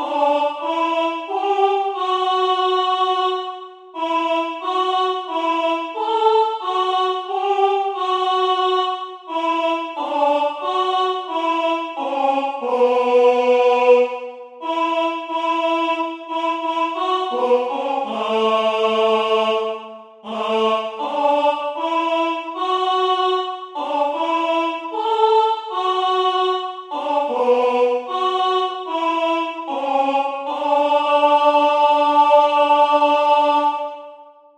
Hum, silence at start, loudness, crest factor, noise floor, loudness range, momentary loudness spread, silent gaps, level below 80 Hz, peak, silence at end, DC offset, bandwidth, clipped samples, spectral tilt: none; 0 s; -19 LUFS; 16 dB; -43 dBFS; 5 LU; 9 LU; none; -76 dBFS; -2 dBFS; 0.3 s; under 0.1%; 10 kHz; under 0.1%; -3.5 dB/octave